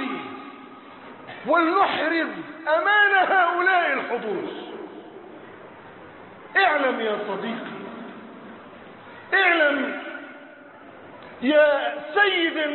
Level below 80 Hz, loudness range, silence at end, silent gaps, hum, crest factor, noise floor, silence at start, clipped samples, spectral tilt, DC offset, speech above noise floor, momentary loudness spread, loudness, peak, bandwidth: -72 dBFS; 6 LU; 0 s; none; none; 18 dB; -45 dBFS; 0 s; under 0.1%; -8 dB/octave; under 0.1%; 24 dB; 25 LU; -21 LUFS; -6 dBFS; 4.4 kHz